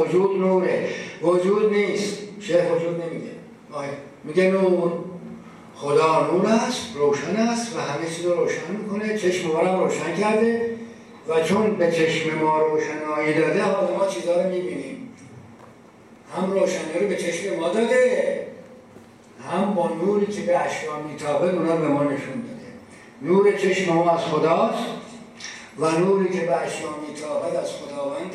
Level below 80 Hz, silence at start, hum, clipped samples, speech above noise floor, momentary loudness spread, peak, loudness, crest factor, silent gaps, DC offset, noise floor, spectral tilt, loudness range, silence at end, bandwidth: -68 dBFS; 0 s; none; under 0.1%; 26 dB; 15 LU; -6 dBFS; -22 LUFS; 16 dB; none; under 0.1%; -48 dBFS; -5.5 dB/octave; 3 LU; 0 s; 12.5 kHz